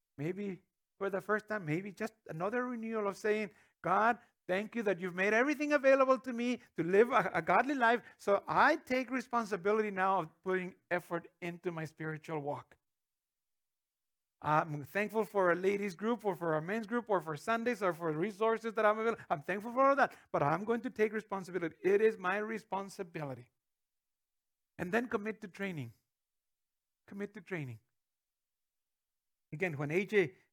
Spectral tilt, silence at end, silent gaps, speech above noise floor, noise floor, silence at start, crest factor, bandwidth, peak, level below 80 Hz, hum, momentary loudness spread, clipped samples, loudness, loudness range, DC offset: -6 dB/octave; 0.2 s; none; over 56 dB; under -90 dBFS; 0.2 s; 22 dB; 19.5 kHz; -14 dBFS; -80 dBFS; none; 13 LU; under 0.1%; -34 LUFS; 11 LU; under 0.1%